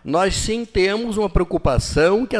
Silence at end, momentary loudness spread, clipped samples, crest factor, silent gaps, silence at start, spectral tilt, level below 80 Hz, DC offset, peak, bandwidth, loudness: 0 s; 4 LU; under 0.1%; 14 dB; none; 0.05 s; -5 dB/octave; -30 dBFS; under 0.1%; -4 dBFS; 11 kHz; -19 LUFS